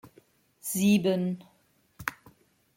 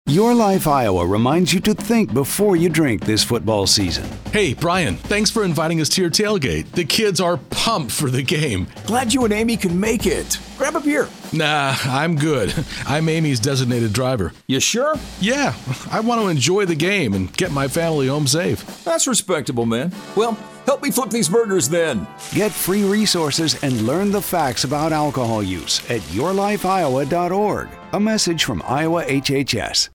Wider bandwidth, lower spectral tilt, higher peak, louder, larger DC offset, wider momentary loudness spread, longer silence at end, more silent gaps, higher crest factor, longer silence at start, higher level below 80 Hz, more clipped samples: second, 16.5 kHz vs 19 kHz; about the same, -5 dB/octave vs -4 dB/octave; second, -10 dBFS vs -2 dBFS; second, -28 LUFS vs -19 LUFS; neither; first, 15 LU vs 6 LU; first, 0.65 s vs 0.05 s; neither; first, 22 dB vs 16 dB; about the same, 0.05 s vs 0.05 s; second, -66 dBFS vs -42 dBFS; neither